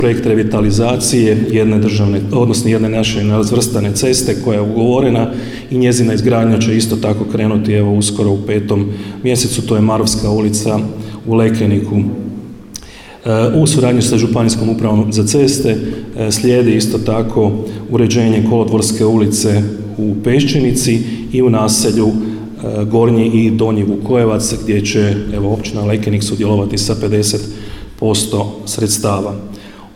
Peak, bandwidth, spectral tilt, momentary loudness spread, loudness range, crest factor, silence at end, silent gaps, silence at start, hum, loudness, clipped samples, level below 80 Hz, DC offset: -2 dBFS; 16 kHz; -5.5 dB/octave; 8 LU; 3 LU; 12 dB; 0 s; none; 0 s; none; -13 LUFS; under 0.1%; -36 dBFS; under 0.1%